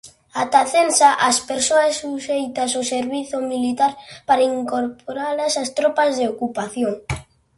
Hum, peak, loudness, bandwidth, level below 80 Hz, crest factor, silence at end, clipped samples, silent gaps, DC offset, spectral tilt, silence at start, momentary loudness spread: none; -2 dBFS; -19 LUFS; 11.5 kHz; -50 dBFS; 18 dB; 0.35 s; under 0.1%; none; under 0.1%; -2.5 dB/octave; 0.05 s; 11 LU